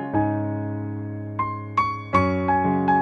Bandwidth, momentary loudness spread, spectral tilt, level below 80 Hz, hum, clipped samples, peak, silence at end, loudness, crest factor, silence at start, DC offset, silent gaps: 8.4 kHz; 10 LU; -8.5 dB/octave; -50 dBFS; none; under 0.1%; -6 dBFS; 0 s; -24 LUFS; 16 dB; 0 s; under 0.1%; none